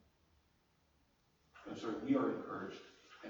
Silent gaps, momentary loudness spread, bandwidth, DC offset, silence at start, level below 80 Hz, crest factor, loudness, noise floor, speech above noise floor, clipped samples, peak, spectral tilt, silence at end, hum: none; 21 LU; 19 kHz; under 0.1%; 1.55 s; -76 dBFS; 22 dB; -40 LUFS; -75 dBFS; 36 dB; under 0.1%; -22 dBFS; -6.5 dB/octave; 0 s; none